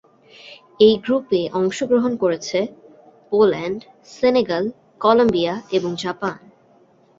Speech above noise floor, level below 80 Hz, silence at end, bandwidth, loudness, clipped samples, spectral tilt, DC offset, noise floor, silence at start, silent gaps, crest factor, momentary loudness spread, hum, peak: 36 dB; -58 dBFS; 0.8 s; 7.8 kHz; -19 LUFS; under 0.1%; -5.5 dB/octave; under 0.1%; -54 dBFS; 0.45 s; none; 18 dB; 12 LU; none; -2 dBFS